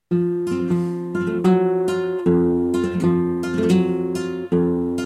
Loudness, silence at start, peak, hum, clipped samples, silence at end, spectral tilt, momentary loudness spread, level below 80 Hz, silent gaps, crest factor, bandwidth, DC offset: -20 LUFS; 0.1 s; -4 dBFS; none; under 0.1%; 0 s; -8 dB/octave; 6 LU; -52 dBFS; none; 14 dB; 12 kHz; under 0.1%